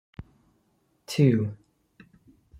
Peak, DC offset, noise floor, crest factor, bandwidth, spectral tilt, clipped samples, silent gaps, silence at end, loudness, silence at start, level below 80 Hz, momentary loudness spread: -8 dBFS; under 0.1%; -69 dBFS; 22 dB; 13.5 kHz; -7.5 dB/octave; under 0.1%; none; 1.05 s; -25 LUFS; 1.1 s; -60 dBFS; 25 LU